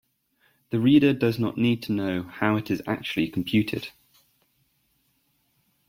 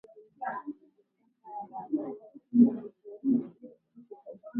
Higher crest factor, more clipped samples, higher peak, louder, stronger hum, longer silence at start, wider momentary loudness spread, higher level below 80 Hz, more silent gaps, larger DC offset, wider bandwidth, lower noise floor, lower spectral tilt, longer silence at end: about the same, 20 dB vs 22 dB; neither; first, -6 dBFS vs -10 dBFS; first, -24 LUFS vs -30 LUFS; neither; first, 0.7 s vs 0.15 s; second, 11 LU vs 24 LU; first, -60 dBFS vs -78 dBFS; neither; neither; first, 16.5 kHz vs 2.1 kHz; about the same, -69 dBFS vs -71 dBFS; second, -7 dB/octave vs -11.5 dB/octave; first, 2 s vs 0 s